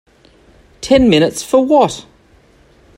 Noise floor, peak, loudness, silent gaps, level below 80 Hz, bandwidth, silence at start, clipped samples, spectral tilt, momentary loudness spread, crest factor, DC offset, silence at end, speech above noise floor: -48 dBFS; 0 dBFS; -12 LUFS; none; -40 dBFS; 16 kHz; 0.8 s; under 0.1%; -5 dB/octave; 15 LU; 16 dB; under 0.1%; 0.95 s; 37 dB